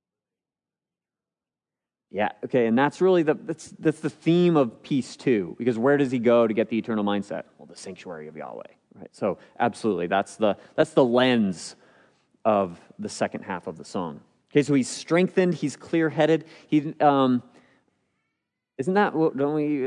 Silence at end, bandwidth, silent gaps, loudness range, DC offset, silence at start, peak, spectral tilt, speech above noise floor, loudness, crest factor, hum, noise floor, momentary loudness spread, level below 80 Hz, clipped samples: 0 s; 10.5 kHz; none; 6 LU; under 0.1%; 2.15 s; -6 dBFS; -6 dB/octave; over 66 dB; -24 LUFS; 18 dB; none; under -90 dBFS; 16 LU; -74 dBFS; under 0.1%